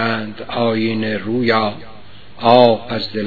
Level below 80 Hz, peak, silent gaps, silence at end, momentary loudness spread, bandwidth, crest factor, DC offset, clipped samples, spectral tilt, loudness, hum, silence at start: -54 dBFS; 0 dBFS; none; 0 s; 12 LU; 5.4 kHz; 18 dB; 2%; 0.1%; -8 dB/octave; -16 LUFS; none; 0 s